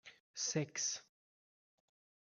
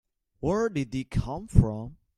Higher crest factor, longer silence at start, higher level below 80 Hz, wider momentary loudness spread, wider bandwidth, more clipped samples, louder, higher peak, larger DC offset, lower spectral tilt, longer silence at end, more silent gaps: about the same, 22 dB vs 22 dB; second, 0.05 s vs 0.4 s; second, -88 dBFS vs -36 dBFS; about the same, 10 LU vs 8 LU; about the same, 11 kHz vs 11.5 kHz; neither; second, -39 LUFS vs -28 LUFS; second, -24 dBFS vs -4 dBFS; neither; second, -2.5 dB/octave vs -8 dB/octave; first, 1.3 s vs 0.25 s; first, 0.20-0.34 s vs none